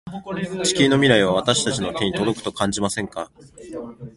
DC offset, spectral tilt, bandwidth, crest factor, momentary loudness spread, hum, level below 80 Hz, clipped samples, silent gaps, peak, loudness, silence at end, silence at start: under 0.1%; -4 dB/octave; 11.5 kHz; 22 dB; 19 LU; none; -50 dBFS; under 0.1%; none; 0 dBFS; -20 LUFS; 0.05 s; 0.05 s